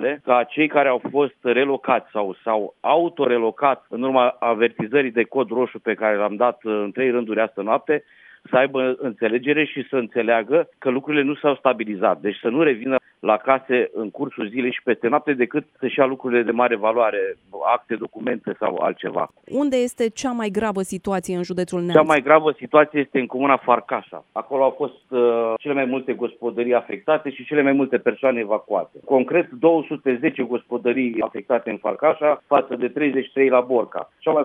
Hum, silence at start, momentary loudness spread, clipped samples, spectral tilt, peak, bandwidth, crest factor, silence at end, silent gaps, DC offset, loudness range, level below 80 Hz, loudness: none; 0 s; 8 LU; under 0.1%; -6 dB/octave; 0 dBFS; 12.5 kHz; 20 dB; 0 s; none; under 0.1%; 3 LU; -66 dBFS; -21 LUFS